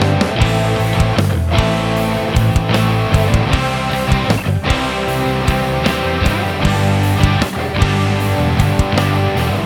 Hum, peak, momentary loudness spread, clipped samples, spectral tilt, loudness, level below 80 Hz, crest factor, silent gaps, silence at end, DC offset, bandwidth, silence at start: none; 0 dBFS; 3 LU; under 0.1%; -6 dB/octave; -15 LUFS; -24 dBFS; 14 dB; none; 0 s; under 0.1%; 18 kHz; 0 s